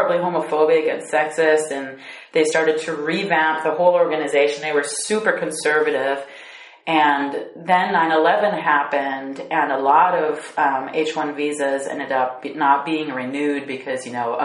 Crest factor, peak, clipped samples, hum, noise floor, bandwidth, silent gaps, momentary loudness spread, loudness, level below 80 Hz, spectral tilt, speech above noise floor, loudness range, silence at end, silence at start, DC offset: 18 dB; -2 dBFS; under 0.1%; none; -41 dBFS; 11.5 kHz; none; 10 LU; -20 LUFS; -74 dBFS; -3.5 dB/octave; 22 dB; 3 LU; 0 s; 0 s; under 0.1%